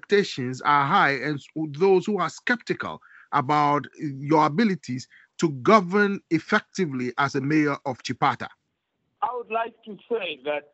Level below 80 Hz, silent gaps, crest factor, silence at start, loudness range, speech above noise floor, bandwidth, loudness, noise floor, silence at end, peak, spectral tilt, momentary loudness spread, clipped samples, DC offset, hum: -72 dBFS; none; 22 dB; 0.1 s; 4 LU; 52 dB; 8.2 kHz; -24 LUFS; -76 dBFS; 0.1 s; -2 dBFS; -6 dB/octave; 13 LU; under 0.1%; under 0.1%; none